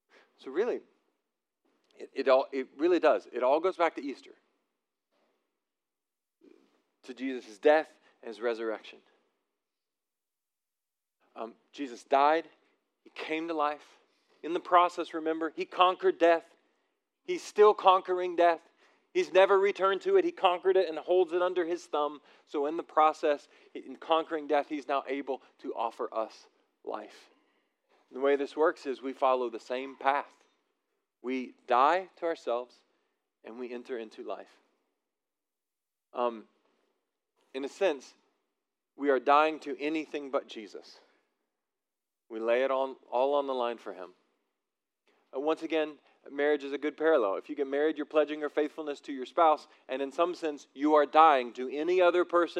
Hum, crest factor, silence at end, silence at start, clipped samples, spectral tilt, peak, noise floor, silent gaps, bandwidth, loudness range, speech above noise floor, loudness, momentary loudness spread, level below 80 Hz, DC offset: none; 24 dB; 0 s; 0.45 s; under 0.1%; -4 dB/octave; -6 dBFS; under -90 dBFS; none; 9.8 kHz; 12 LU; over 61 dB; -29 LUFS; 18 LU; under -90 dBFS; under 0.1%